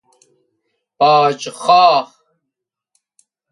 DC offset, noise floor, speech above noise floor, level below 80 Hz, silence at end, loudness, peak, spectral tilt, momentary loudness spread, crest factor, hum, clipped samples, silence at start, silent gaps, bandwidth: under 0.1%; -80 dBFS; 68 dB; -74 dBFS; 1.45 s; -13 LUFS; 0 dBFS; -3.5 dB/octave; 10 LU; 18 dB; none; under 0.1%; 1 s; none; 11.5 kHz